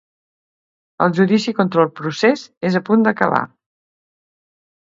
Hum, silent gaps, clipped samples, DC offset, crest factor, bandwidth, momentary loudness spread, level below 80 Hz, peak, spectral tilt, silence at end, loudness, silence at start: none; 2.57-2.61 s; under 0.1%; under 0.1%; 18 dB; 7.6 kHz; 6 LU; -64 dBFS; 0 dBFS; -6.5 dB/octave; 1.4 s; -17 LUFS; 1 s